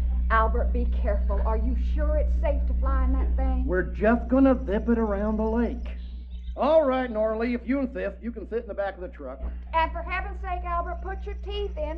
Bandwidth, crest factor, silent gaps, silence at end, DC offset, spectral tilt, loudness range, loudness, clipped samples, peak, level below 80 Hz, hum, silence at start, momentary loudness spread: 4.8 kHz; 16 dB; none; 0 s; under 0.1%; -9.5 dB/octave; 6 LU; -26 LUFS; under 0.1%; -8 dBFS; -28 dBFS; 60 Hz at -30 dBFS; 0 s; 14 LU